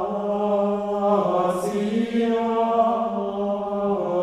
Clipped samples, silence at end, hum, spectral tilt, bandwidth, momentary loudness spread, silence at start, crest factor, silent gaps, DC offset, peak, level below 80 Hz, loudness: under 0.1%; 0 s; none; -7 dB/octave; 14 kHz; 5 LU; 0 s; 14 dB; none; under 0.1%; -8 dBFS; -58 dBFS; -23 LUFS